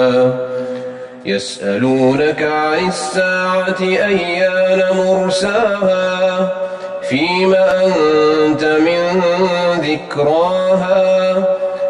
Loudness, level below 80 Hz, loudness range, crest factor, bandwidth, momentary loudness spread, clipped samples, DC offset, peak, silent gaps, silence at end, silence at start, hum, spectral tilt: -14 LUFS; -52 dBFS; 2 LU; 12 dB; 11 kHz; 8 LU; under 0.1%; under 0.1%; -2 dBFS; none; 0 s; 0 s; none; -5 dB/octave